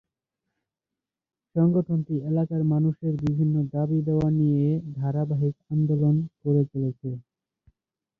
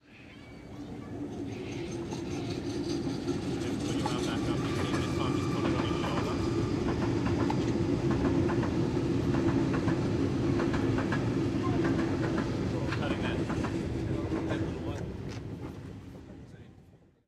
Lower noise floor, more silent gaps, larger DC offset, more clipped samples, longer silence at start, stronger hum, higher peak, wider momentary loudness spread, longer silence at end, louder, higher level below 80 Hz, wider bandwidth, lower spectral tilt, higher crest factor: first, under -90 dBFS vs -58 dBFS; neither; neither; neither; first, 1.55 s vs 0.1 s; neither; first, -12 dBFS vs -16 dBFS; second, 6 LU vs 13 LU; first, 1 s vs 0.3 s; first, -25 LUFS vs -31 LUFS; second, -58 dBFS vs -48 dBFS; second, 2.4 kHz vs 13 kHz; first, -12 dB/octave vs -7 dB/octave; about the same, 14 dB vs 16 dB